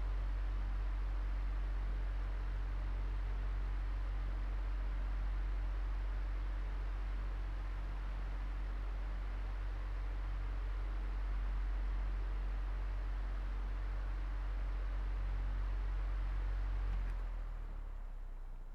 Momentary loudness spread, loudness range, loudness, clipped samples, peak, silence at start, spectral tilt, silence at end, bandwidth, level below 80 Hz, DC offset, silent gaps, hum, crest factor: 3 LU; 2 LU; -43 LUFS; under 0.1%; -30 dBFS; 0 s; -7 dB/octave; 0 s; 5.2 kHz; -38 dBFS; under 0.1%; none; none; 8 dB